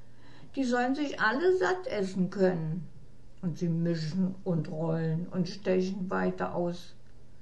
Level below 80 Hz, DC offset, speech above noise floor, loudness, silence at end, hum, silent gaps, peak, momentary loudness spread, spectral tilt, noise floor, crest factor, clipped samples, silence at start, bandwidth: -60 dBFS; 0.8%; 24 dB; -31 LUFS; 0.05 s; none; none; -14 dBFS; 10 LU; -7 dB/octave; -54 dBFS; 16 dB; under 0.1%; 0.25 s; 9.2 kHz